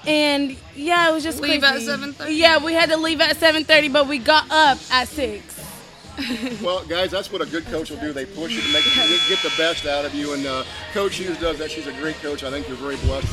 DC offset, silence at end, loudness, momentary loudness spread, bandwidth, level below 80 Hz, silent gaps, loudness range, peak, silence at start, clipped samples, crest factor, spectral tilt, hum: under 0.1%; 0 s; -19 LUFS; 14 LU; 16 kHz; -40 dBFS; none; 9 LU; 0 dBFS; 0 s; under 0.1%; 20 dB; -3 dB/octave; none